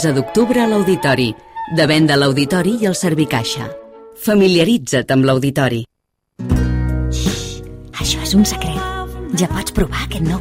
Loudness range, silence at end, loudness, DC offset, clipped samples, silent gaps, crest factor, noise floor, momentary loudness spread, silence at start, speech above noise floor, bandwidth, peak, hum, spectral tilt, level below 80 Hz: 4 LU; 0 s; -16 LUFS; under 0.1%; under 0.1%; none; 14 dB; -72 dBFS; 12 LU; 0 s; 57 dB; 16 kHz; -2 dBFS; none; -5 dB/octave; -28 dBFS